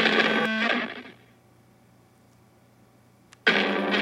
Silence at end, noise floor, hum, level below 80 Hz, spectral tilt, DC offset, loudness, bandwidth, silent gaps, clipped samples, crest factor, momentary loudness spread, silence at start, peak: 0 s; -58 dBFS; none; -74 dBFS; -4 dB/octave; under 0.1%; -23 LUFS; 12.5 kHz; none; under 0.1%; 22 dB; 10 LU; 0 s; -6 dBFS